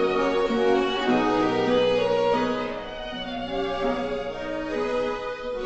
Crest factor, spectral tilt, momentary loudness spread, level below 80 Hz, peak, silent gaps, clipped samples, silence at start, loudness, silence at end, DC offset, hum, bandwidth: 14 dB; -5.5 dB/octave; 9 LU; -46 dBFS; -10 dBFS; none; under 0.1%; 0 s; -25 LUFS; 0 s; under 0.1%; none; 8.2 kHz